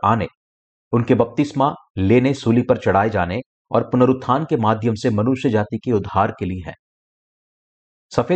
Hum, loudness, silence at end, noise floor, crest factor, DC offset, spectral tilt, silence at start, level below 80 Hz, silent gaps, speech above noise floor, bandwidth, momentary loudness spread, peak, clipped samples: none; -19 LUFS; 0 s; under -90 dBFS; 16 dB; under 0.1%; -8 dB/octave; 0.05 s; -50 dBFS; 0.37-0.91 s, 1.90-1.95 s, 3.46-3.65 s, 6.79-8.10 s; over 72 dB; 8.6 kHz; 8 LU; -4 dBFS; under 0.1%